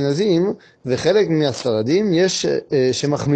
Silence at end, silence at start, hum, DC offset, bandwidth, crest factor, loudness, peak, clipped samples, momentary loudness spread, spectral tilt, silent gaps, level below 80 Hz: 0 s; 0 s; none; under 0.1%; 9.2 kHz; 14 dB; -18 LUFS; -4 dBFS; under 0.1%; 5 LU; -5.5 dB/octave; none; -54 dBFS